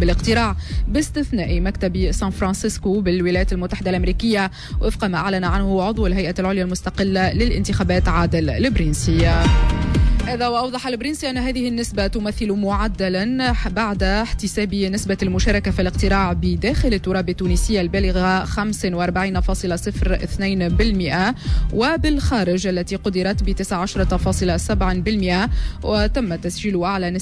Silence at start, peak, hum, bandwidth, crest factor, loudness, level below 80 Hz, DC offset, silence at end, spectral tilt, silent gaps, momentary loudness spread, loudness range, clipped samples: 0 s; -6 dBFS; none; 11 kHz; 12 dB; -20 LUFS; -24 dBFS; under 0.1%; 0 s; -5.5 dB/octave; none; 4 LU; 2 LU; under 0.1%